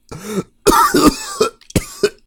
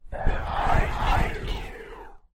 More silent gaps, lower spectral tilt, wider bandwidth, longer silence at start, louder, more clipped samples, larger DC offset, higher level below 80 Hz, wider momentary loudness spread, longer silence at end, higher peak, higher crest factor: neither; second, -4 dB/octave vs -6 dB/octave; first, 19.5 kHz vs 9.6 kHz; about the same, 0.1 s vs 0.05 s; first, -16 LUFS vs -27 LUFS; neither; neither; second, -34 dBFS vs -28 dBFS; second, 13 LU vs 17 LU; about the same, 0.15 s vs 0.15 s; first, 0 dBFS vs -8 dBFS; about the same, 16 dB vs 16 dB